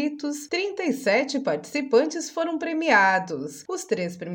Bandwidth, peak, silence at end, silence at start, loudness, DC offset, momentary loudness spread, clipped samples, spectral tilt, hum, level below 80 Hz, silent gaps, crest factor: 17 kHz; -6 dBFS; 0 s; 0 s; -24 LUFS; under 0.1%; 13 LU; under 0.1%; -4 dB/octave; none; -78 dBFS; none; 20 dB